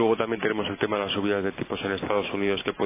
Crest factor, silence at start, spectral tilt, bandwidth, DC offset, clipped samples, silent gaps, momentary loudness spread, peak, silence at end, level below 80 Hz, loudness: 18 dB; 0 s; -9.5 dB/octave; 3.8 kHz; under 0.1%; under 0.1%; none; 4 LU; -8 dBFS; 0 s; -54 dBFS; -27 LUFS